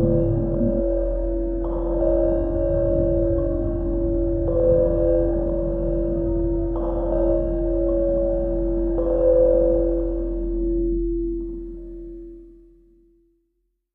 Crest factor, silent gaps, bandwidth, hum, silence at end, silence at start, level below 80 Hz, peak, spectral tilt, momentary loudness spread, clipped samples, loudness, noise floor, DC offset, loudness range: 14 dB; none; 1.9 kHz; none; 1.45 s; 0 s; -28 dBFS; -6 dBFS; -13 dB/octave; 8 LU; under 0.1%; -22 LUFS; -72 dBFS; under 0.1%; 6 LU